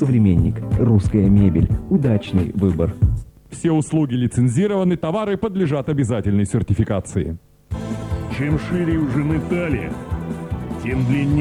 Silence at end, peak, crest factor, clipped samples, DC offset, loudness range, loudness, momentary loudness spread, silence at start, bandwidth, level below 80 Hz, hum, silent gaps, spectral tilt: 0 s; -2 dBFS; 16 dB; under 0.1%; under 0.1%; 5 LU; -20 LUFS; 11 LU; 0 s; 11.5 kHz; -32 dBFS; none; none; -8 dB/octave